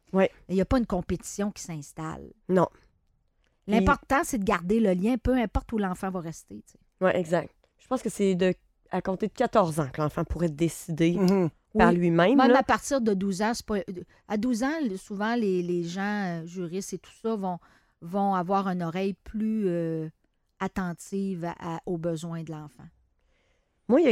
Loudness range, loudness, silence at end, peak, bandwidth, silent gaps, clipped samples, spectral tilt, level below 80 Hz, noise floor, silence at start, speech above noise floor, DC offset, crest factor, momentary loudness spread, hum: 8 LU; -27 LUFS; 0 s; -6 dBFS; 15 kHz; none; under 0.1%; -6 dB/octave; -46 dBFS; -70 dBFS; 0.15 s; 43 dB; under 0.1%; 22 dB; 15 LU; none